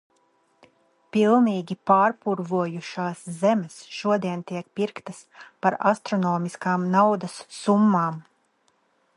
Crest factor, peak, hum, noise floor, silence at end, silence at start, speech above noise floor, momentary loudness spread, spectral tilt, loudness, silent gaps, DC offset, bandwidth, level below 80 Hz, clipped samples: 20 dB; -4 dBFS; none; -67 dBFS; 0.95 s; 1.15 s; 44 dB; 12 LU; -6.5 dB/octave; -23 LUFS; none; under 0.1%; 11 kHz; -74 dBFS; under 0.1%